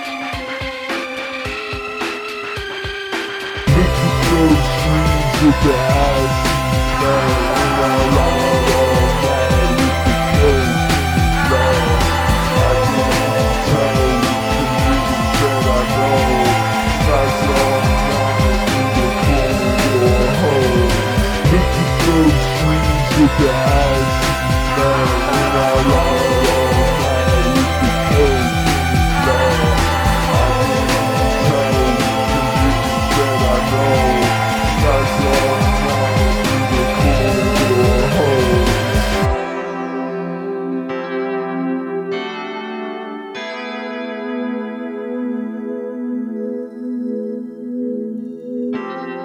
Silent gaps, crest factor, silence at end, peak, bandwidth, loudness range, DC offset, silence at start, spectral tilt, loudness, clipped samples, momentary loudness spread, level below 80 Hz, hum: none; 10 dB; 0 s; -4 dBFS; 19 kHz; 10 LU; under 0.1%; 0 s; -5.5 dB/octave; -16 LUFS; under 0.1%; 10 LU; -24 dBFS; none